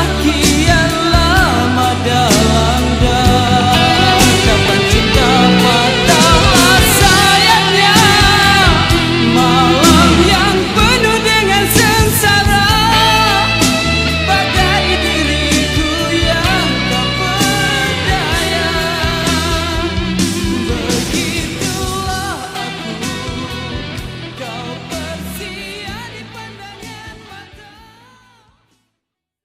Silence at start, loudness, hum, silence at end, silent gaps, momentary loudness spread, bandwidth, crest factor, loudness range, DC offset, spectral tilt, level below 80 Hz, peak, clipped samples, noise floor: 0 s; -11 LUFS; none; 2 s; none; 16 LU; 16.5 kHz; 12 dB; 16 LU; under 0.1%; -3.5 dB/octave; -24 dBFS; 0 dBFS; under 0.1%; -77 dBFS